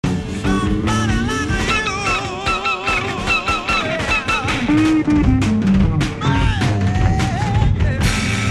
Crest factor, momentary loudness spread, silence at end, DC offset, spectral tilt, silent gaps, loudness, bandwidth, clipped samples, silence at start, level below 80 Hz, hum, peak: 14 dB; 4 LU; 0 s; under 0.1%; -5.5 dB/octave; none; -17 LUFS; 13 kHz; under 0.1%; 0.05 s; -26 dBFS; none; -2 dBFS